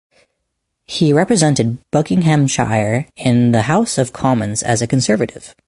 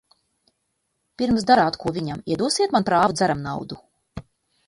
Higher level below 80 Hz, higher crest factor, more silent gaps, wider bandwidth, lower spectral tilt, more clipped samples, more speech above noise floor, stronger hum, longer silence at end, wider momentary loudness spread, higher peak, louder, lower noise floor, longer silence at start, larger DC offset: first, -46 dBFS vs -52 dBFS; second, 14 dB vs 20 dB; neither; about the same, 11.5 kHz vs 11.5 kHz; about the same, -5.5 dB/octave vs -4.5 dB/octave; neither; first, 58 dB vs 54 dB; neither; second, 0.2 s vs 0.45 s; second, 5 LU vs 23 LU; first, 0 dBFS vs -4 dBFS; first, -15 LUFS vs -21 LUFS; about the same, -73 dBFS vs -74 dBFS; second, 0.9 s vs 1.2 s; neither